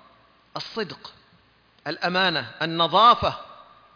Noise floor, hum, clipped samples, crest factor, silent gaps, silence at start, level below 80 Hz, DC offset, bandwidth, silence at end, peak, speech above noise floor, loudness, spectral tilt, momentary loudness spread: -59 dBFS; none; under 0.1%; 20 dB; none; 0.55 s; -56 dBFS; under 0.1%; 5.4 kHz; 0.4 s; -6 dBFS; 37 dB; -21 LUFS; -5 dB/octave; 21 LU